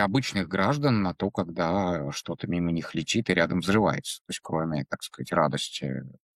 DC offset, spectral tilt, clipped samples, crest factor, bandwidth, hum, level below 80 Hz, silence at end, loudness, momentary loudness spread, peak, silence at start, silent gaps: under 0.1%; -5.5 dB/octave; under 0.1%; 20 dB; 14 kHz; none; -56 dBFS; 0.2 s; -27 LUFS; 10 LU; -8 dBFS; 0 s; 4.21-4.25 s